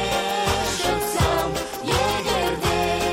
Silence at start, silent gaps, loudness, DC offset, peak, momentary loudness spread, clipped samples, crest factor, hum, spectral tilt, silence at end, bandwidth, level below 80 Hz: 0 s; none; -22 LUFS; under 0.1%; -8 dBFS; 3 LU; under 0.1%; 14 dB; none; -3.5 dB/octave; 0 s; 16.5 kHz; -36 dBFS